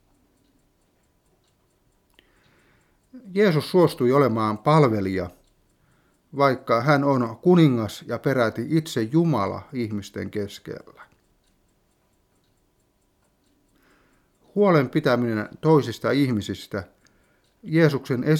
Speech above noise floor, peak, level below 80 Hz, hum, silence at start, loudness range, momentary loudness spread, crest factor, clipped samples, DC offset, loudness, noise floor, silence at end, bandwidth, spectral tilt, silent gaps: 45 dB; -4 dBFS; -62 dBFS; none; 3.15 s; 10 LU; 13 LU; 20 dB; under 0.1%; under 0.1%; -22 LUFS; -66 dBFS; 0 s; 15.5 kHz; -7.5 dB/octave; none